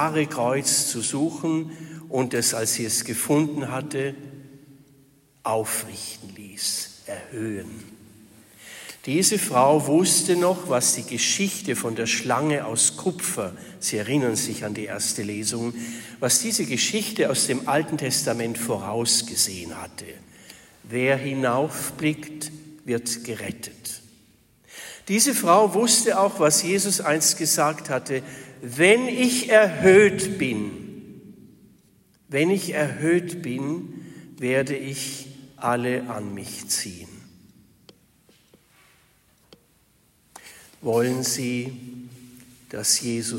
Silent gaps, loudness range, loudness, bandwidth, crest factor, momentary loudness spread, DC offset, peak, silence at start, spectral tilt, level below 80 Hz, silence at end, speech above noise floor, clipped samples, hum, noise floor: none; 10 LU; -22 LUFS; 16.5 kHz; 20 dB; 18 LU; under 0.1%; -4 dBFS; 0 s; -3 dB/octave; -64 dBFS; 0 s; 38 dB; under 0.1%; none; -61 dBFS